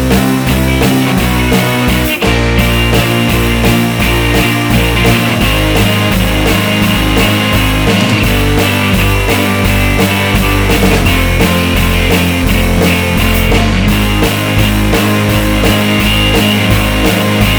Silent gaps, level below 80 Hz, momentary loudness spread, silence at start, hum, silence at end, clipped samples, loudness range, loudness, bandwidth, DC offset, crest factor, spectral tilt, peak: none; -18 dBFS; 2 LU; 0 s; none; 0 s; under 0.1%; 0 LU; -10 LUFS; over 20 kHz; under 0.1%; 10 dB; -5 dB/octave; 0 dBFS